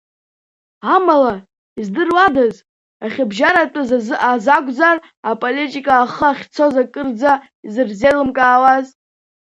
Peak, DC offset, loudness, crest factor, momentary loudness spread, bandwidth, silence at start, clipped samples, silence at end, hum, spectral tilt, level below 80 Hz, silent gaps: 0 dBFS; under 0.1%; -15 LUFS; 16 dB; 12 LU; 10.5 kHz; 0.85 s; under 0.1%; 0.7 s; none; -5 dB/octave; -54 dBFS; 1.58-1.76 s, 2.69-3.00 s, 5.17-5.23 s, 7.55-7.63 s